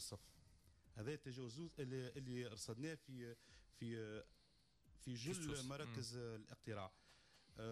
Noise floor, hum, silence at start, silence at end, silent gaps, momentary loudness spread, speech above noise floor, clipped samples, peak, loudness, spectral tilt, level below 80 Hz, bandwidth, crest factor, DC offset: -76 dBFS; none; 0 s; 0 s; none; 16 LU; 26 dB; under 0.1%; -38 dBFS; -52 LUFS; -5 dB/octave; -72 dBFS; 13 kHz; 14 dB; under 0.1%